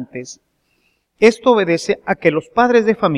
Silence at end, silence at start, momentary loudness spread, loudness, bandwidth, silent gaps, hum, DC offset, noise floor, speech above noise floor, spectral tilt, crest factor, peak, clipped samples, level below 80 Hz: 0 s; 0 s; 16 LU; -15 LUFS; 11.5 kHz; none; none; under 0.1%; -63 dBFS; 48 dB; -5.5 dB/octave; 16 dB; 0 dBFS; under 0.1%; -54 dBFS